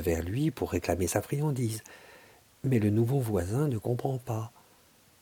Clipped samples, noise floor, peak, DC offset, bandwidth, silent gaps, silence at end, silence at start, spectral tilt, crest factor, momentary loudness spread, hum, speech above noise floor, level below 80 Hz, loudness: under 0.1%; -61 dBFS; -12 dBFS; under 0.1%; 19 kHz; none; 0.75 s; 0 s; -6.5 dB/octave; 18 dB; 10 LU; none; 32 dB; -52 dBFS; -30 LUFS